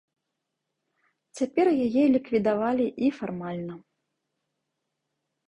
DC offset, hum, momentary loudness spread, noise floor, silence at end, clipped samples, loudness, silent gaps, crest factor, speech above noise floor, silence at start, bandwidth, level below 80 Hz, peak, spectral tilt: under 0.1%; none; 12 LU; -82 dBFS; 1.7 s; under 0.1%; -25 LUFS; none; 16 dB; 58 dB; 1.35 s; 10.5 kHz; -66 dBFS; -12 dBFS; -7 dB/octave